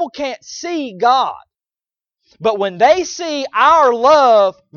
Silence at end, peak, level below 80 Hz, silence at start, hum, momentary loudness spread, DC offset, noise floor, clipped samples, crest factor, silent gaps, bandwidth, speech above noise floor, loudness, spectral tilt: 0.25 s; 0 dBFS; -56 dBFS; 0 s; none; 13 LU; under 0.1%; under -90 dBFS; under 0.1%; 14 dB; none; 7.2 kHz; over 76 dB; -14 LUFS; -3 dB/octave